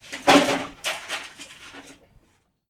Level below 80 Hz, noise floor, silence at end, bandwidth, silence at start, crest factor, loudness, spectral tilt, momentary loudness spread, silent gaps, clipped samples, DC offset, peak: -58 dBFS; -65 dBFS; 0.8 s; 18.5 kHz; 0.1 s; 22 dB; -22 LUFS; -3 dB/octave; 24 LU; none; under 0.1%; under 0.1%; -4 dBFS